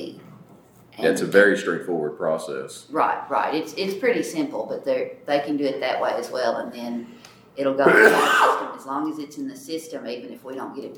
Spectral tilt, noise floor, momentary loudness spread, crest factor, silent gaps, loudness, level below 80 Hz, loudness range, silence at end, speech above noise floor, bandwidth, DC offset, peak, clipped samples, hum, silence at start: -4 dB/octave; -51 dBFS; 17 LU; 22 dB; none; -22 LUFS; -74 dBFS; 5 LU; 0 s; 28 dB; over 20 kHz; under 0.1%; -2 dBFS; under 0.1%; none; 0 s